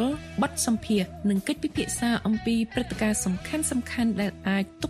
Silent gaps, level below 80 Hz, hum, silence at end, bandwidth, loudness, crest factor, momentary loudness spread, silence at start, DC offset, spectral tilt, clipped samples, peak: none; -48 dBFS; none; 0 s; 14 kHz; -27 LUFS; 16 dB; 3 LU; 0 s; under 0.1%; -4.5 dB/octave; under 0.1%; -12 dBFS